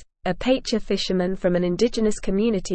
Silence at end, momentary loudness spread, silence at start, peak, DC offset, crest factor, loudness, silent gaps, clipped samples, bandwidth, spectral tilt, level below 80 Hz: 0 s; 3 LU; 0 s; -8 dBFS; under 0.1%; 14 dB; -23 LUFS; none; under 0.1%; 8.8 kHz; -5.5 dB/octave; -40 dBFS